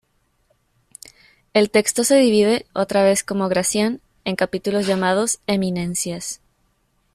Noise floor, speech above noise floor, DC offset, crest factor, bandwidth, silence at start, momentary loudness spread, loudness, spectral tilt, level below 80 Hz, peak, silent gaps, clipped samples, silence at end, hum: -65 dBFS; 46 dB; under 0.1%; 18 dB; 15 kHz; 1.55 s; 10 LU; -19 LUFS; -4 dB/octave; -56 dBFS; -4 dBFS; none; under 0.1%; 0.8 s; none